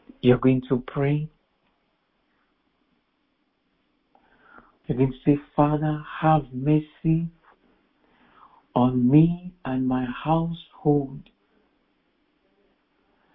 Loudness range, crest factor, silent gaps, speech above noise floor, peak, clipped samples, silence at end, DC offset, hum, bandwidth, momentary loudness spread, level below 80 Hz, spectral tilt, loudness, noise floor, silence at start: 7 LU; 20 dB; none; 49 dB; -4 dBFS; under 0.1%; 2.15 s; under 0.1%; none; 4 kHz; 12 LU; -52 dBFS; -12.5 dB/octave; -23 LUFS; -71 dBFS; 0.25 s